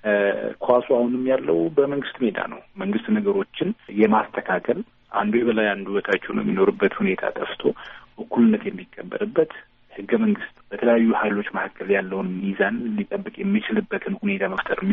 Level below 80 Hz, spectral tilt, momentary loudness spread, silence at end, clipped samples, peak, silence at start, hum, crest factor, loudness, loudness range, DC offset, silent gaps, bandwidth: -60 dBFS; -5 dB/octave; 10 LU; 0 s; under 0.1%; -4 dBFS; 0.05 s; none; 18 dB; -23 LUFS; 2 LU; under 0.1%; none; 3.9 kHz